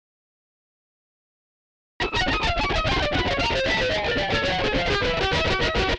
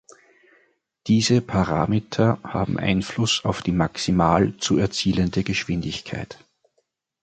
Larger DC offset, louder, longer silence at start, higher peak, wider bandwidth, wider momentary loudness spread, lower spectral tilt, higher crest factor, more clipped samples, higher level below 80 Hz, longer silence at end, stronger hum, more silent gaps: neither; about the same, -22 LUFS vs -22 LUFS; first, 2 s vs 1.05 s; second, -10 dBFS vs -2 dBFS; about the same, 9.8 kHz vs 9.2 kHz; second, 1 LU vs 9 LU; about the same, -4.5 dB/octave vs -5.5 dB/octave; about the same, 16 dB vs 20 dB; neither; first, -34 dBFS vs -44 dBFS; second, 0 s vs 0.9 s; neither; neither